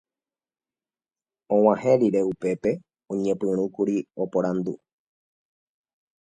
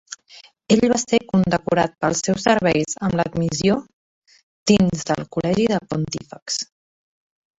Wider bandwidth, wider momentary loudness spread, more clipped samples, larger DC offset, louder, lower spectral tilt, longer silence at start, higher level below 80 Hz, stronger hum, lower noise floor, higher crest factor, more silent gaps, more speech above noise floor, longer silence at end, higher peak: first, 10 kHz vs 8 kHz; about the same, 11 LU vs 9 LU; neither; neither; second, -24 LUFS vs -20 LUFS; first, -8 dB/octave vs -5 dB/octave; first, 1.5 s vs 0.1 s; second, -66 dBFS vs -48 dBFS; neither; first, under -90 dBFS vs -48 dBFS; about the same, 22 dB vs 18 dB; second, none vs 3.93-4.22 s, 4.43-4.66 s, 6.42-6.46 s; first, over 67 dB vs 29 dB; first, 1.45 s vs 0.95 s; about the same, -4 dBFS vs -2 dBFS